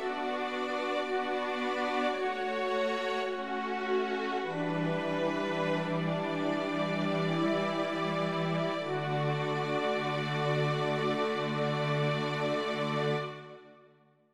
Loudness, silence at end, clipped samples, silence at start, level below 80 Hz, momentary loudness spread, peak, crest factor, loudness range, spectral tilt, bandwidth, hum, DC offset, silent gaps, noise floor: -32 LUFS; 0.45 s; under 0.1%; 0 s; -72 dBFS; 3 LU; -18 dBFS; 12 dB; 1 LU; -6.5 dB/octave; 12 kHz; none; 0.1%; none; -63 dBFS